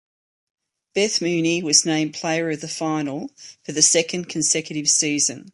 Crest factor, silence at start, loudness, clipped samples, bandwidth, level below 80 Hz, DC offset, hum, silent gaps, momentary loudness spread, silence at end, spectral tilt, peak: 22 dB; 0.95 s; -20 LUFS; under 0.1%; 11.5 kHz; -68 dBFS; under 0.1%; none; none; 13 LU; 0.05 s; -2 dB/octave; -2 dBFS